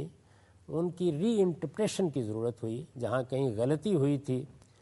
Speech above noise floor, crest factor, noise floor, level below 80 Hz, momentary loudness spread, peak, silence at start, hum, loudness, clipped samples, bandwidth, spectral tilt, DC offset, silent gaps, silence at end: 30 dB; 14 dB; -61 dBFS; -68 dBFS; 10 LU; -18 dBFS; 0 s; none; -32 LUFS; under 0.1%; 11.5 kHz; -7 dB/octave; under 0.1%; none; 0.25 s